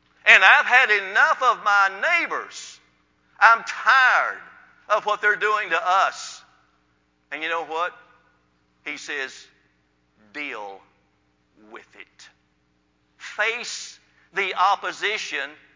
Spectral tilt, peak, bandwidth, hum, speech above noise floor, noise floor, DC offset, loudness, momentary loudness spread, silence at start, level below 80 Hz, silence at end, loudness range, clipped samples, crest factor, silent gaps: 0 dB/octave; 0 dBFS; 7.6 kHz; 60 Hz at -70 dBFS; 45 dB; -67 dBFS; under 0.1%; -19 LUFS; 21 LU; 0.25 s; -74 dBFS; 0.2 s; 17 LU; under 0.1%; 24 dB; none